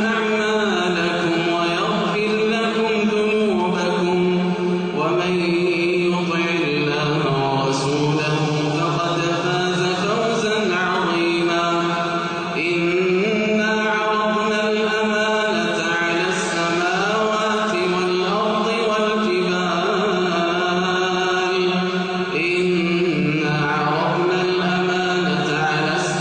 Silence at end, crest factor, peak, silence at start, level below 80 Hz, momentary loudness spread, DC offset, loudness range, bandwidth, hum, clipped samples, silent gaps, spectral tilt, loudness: 0 s; 12 dB; -8 dBFS; 0 s; -56 dBFS; 2 LU; under 0.1%; 1 LU; 9.4 kHz; none; under 0.1%; none; -5 dB/octave; -19 LUFS